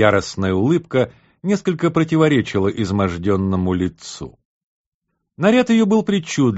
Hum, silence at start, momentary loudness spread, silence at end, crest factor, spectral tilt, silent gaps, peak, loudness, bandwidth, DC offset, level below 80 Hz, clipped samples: none; 0 s; 10 LU; 0 s; 18 dB; -6 dB/octave; 4.45-5.02 s; 0 dBFS; -18 LUFS; 8 kHz; under 0.1%; -48 dBFS; under 0.1%